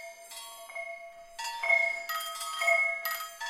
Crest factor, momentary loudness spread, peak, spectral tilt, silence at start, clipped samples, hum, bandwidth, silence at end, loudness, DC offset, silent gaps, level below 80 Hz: 20 dB; 18 LU; -14 dBFS; 3 dB/octave; 0 s; under 0.1%; none; 17 kHz; 0 s; -29 LUFS; under 0.1%; none; -72 dBFS